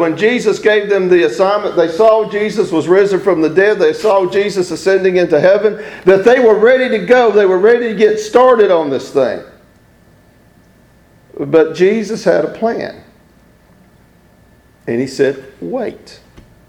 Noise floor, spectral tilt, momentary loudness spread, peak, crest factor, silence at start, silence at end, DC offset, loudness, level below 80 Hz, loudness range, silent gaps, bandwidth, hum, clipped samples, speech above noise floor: -47 dBFS; -5.5 dB/octave; 10 LU; 0 dBFS; 12 dB; 0 s; 0.6 s; under 0.1%; -12 LUFS; -52 dBFS; 10 LU; none; 12 kHz; none; 0.1%; 36 dB